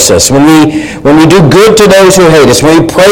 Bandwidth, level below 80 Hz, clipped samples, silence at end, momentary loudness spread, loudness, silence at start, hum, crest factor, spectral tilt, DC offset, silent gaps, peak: over 20 kHz; -28 dBFS; 10%; 0 s; 4 LU; -3 LUFS; 0 s; none; 2 dB; -4.5 dB/octave; 2%; none; 0 dBFS